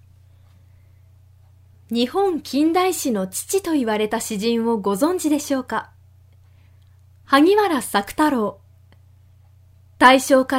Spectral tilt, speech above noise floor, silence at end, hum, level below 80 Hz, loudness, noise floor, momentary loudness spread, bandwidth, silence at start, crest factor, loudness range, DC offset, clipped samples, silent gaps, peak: -3.5 dB/octave; 32 dB; 0 s; none; -58 dBFS; -19 LUFS; -50 dBFS; 9 LU; 16 kHz; 1.9 s; 22 dB; 4 LU; under 0.1%; under 0.1%; none; 0 dBFS